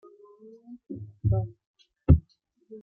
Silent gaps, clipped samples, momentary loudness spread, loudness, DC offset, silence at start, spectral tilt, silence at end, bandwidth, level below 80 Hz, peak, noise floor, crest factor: 1.67-1.74 s; under 0.1%; 25 LU; -26 LUFS; under 0.1%; 0.7 s; -12.5 dB/octave; 0.05 s; 3.4 kHz; -38 dBFS; -4 dBFS; -65 dBFS; 24 dB